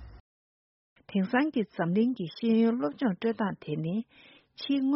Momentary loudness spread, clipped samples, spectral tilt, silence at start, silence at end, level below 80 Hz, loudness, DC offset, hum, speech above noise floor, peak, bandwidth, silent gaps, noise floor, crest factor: 9 LU; under 0.1%; -6 dB/octave; 0 s; 0 s; -62 dBFS; -29 LUFS; under 0.1%; none; over 62 dB; -14 dBFS; 5.8 kHz; 0.20-0.96 s; under -90 dBFS; 16 dB